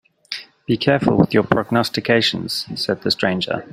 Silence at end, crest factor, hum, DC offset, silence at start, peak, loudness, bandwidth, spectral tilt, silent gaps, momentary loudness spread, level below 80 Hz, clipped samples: 0.05 s; 18 dB; none; under 0.1%; 0.3 s; 0 dBFS; -18 LUFS; 16 kHz; -5.5 dB/octave; none; 12 LU; -50 dBFS; under 0.1%